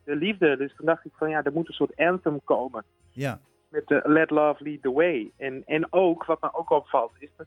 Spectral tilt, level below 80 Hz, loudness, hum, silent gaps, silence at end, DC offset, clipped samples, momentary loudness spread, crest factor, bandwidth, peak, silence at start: -7.5 dB/octave; -66 dBFS; -25 LUFS; none; none; 0 s; under 0.1%; under 0.1%; 12 LU; 18 dB; 11.5 kHz; -8 dBFS; 0.05 s